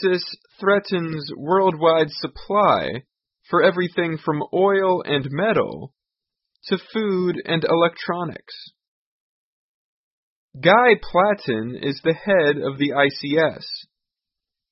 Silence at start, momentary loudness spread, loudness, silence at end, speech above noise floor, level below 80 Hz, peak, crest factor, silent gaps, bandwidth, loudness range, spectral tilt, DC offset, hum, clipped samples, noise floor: 0 s; 12 LU; -20 LUFS; 0.9 s; 65 dB; -56 dBFS; -2 dBFS; 20 dB; 8.88-10.49 s; 5.8 kHz; 5 LU; -9.5 dB/octave; under 0.1%; none; under 0.1%; -85 dBFS